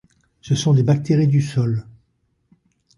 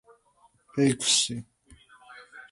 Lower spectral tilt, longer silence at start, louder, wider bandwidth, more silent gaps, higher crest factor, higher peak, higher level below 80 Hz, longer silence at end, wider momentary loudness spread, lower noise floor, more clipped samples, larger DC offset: first, -7 dB/octave vs -3 dB/octave; second, 0.45 s vs 0.75 s; first, -19 LUFS vs -24 LUFS; about the same, 11.5 kHz vs 11.5 kHz; neither; second, 14 dB vs 20 dB; first, -6 dBFS vs -10 dBFS; first, -52 dBFS vs -64 dBFS; first, 1.15 s vs 0.1 s; second, 7 LU vs 24 LU; about the same, -67 dBFS vs -64 dBFS; neither; neither